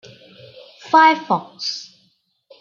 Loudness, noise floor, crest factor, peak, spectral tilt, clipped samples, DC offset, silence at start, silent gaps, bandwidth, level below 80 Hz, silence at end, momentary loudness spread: -17 LUFS; -63 dBFS; 20 dB; -2 dBFS; -3.5 dB/octave; under 0.1%; under 0.1%; 0.85 s; none; 7.2 kHz; -76 dBFS; 0.75 s; 13 LU